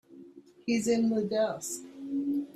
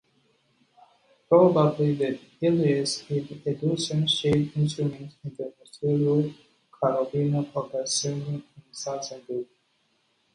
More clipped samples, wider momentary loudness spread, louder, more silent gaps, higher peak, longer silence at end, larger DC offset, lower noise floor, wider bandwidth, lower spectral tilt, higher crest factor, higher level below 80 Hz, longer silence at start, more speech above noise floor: neither; second, 11 LU vs 14 LU; second, -31 LUFS vs -26 LUFS; neither; second, -16 dBFS vs -8 dBFS; second, 0.05 s vs 0.9 s; neither; second, -53 dBFS vs -70 dBFS; first, 14.5 kHz vs 11 kHz; about the same, -4.5 dB/octave vs -5.5 dB/octave; about the same, 16 dB vs 20 dB; second, -72 dBFS vs -62 dBFS; second, 0.1 s vs 1.3 s; second, 24 dB vs 45 dB